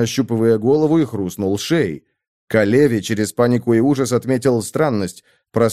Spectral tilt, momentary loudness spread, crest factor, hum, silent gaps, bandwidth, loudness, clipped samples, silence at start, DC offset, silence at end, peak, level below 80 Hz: -6 dB/octave; 7 LU; 16 dB; none; 2.28-2.48 s; 15 kHz; -17 LUFS; under 0.1%; 0 s; 0.2%; 0 s; -2 dBFS; -56 dBFS